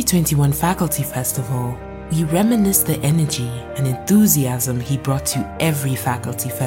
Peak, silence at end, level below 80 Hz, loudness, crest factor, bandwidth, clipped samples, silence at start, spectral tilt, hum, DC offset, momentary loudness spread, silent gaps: 0 dBFS; 0 s; -40 dBFS; -18 LUFS; 18 dB; 17 kHz; under 0.1%; 0 s; -5 dB/octave; none; under 0.1%; 9 LU; none